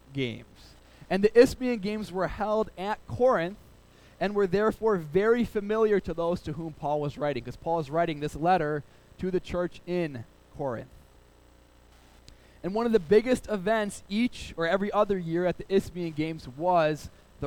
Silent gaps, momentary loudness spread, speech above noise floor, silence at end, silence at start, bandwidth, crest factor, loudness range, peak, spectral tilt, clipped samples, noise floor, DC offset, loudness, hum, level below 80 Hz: none; 11 LU; 30 dB; 0 s; 0.1 s; 17 kHz; 22 dB; 7 LU; -6 dBFS; -6.5 dB/octave; under 0.1%; -57 dBFS; under 0.1%; -28 LUFS; none; -50 dBFS